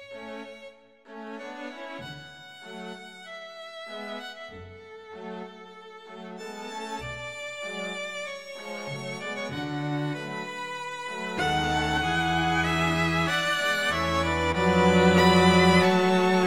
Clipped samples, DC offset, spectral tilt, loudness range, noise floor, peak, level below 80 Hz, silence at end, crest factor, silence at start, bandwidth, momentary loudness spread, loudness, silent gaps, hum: under 0.1%; 0.1%; -5 dB/octave; 18 LU; -49 dBFS; -8 dBFS; -48 dBFS; 0 s; 20 dB; 0 s; 15.5 kHz; 23 LU; -25 LUFS; none; none